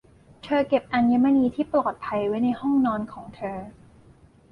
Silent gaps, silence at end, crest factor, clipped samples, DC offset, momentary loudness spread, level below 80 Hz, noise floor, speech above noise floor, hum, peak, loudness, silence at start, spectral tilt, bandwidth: none; 0.8 s; 16 dB; under 0.1%; under 0.1%; 15 LU; -56 dBFS; -54 dBFS; 30 dB; none; -10 dBFS; -23 LUFS; 0.45 s; -8 dB/octave; 5.6 kHz